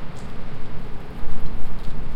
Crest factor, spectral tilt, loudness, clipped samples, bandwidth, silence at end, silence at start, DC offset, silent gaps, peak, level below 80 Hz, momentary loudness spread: 10 dB; -7 dB/octave; -36 LUFS; under 0.1%; 4.7 kHz; 0 s; 0 s; under 0.1%; none; -4 dBFS; -30 dBFS; 2 LU